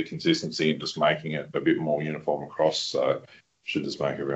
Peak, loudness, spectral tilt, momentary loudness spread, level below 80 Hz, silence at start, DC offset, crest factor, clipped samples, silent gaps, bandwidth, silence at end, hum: -8 dBFS; -27 LUFS; -5 dB/octave; 6 LU; -66 dBFS; 0 s; under 0.1%; 20 dB; under 0.1%; none; 8.2 kHz; 0 s; none